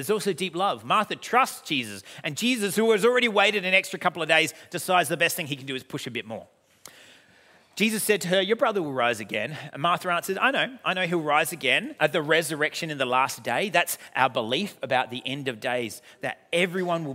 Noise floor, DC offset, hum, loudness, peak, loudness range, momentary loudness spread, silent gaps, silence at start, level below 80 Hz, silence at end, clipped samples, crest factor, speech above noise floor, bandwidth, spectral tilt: -57 dBFS; under 0.1%; none; -25 LUFS; -4 dBFS; 5 LU; 11 LU; none; 0 s; -78 dBFS; 0 s; under 0.1%; 22 dB; 32 dB; 16 kHz; -3.5 dB/octave